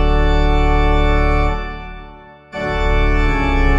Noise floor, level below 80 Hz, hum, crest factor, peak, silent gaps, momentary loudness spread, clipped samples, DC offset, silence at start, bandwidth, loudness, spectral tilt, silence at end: -38 dBFS; -16 dBFS; none; 12 dB; -2 dBFS; none; 15 LU; under 0.1%; under 0.1%; 0 s; 7.4 kHz; -17 LUFS; -7 dB/octave; 0 s